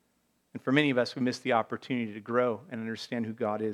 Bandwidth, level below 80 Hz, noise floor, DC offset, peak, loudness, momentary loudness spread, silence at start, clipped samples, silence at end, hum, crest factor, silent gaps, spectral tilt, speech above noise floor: 12 kHz; -82 dBFS; -73 dBFS; under 0.1%; -8 dBFS; -30 LUFS; 11 LU; 0.55 s; under 0.1%; 0 s; none; 22 dB; none; -6 dB/octave; 43 dB